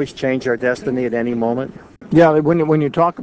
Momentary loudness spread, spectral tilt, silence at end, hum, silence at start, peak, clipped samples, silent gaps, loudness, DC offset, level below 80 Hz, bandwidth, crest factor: 8 LU; -7.5 dB/octave; 0 s; none; 0 s; 0 dBFS; under 0.1%; none; -17 LUFS; under 0.1%; -50 dBFS; 8 kHz; 16 dB